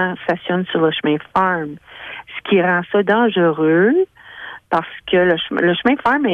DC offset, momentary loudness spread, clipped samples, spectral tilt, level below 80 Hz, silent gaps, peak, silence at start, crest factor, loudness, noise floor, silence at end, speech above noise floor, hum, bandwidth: under 0.1%; 16 LU; under 0.1%; -8 dB/octave; -56 dBFS; none; -2 dBFS; 0 s; 14 dB; -17 LUFS; -36 dBFS; 0 s; 19 dB; none; 5.4 kHz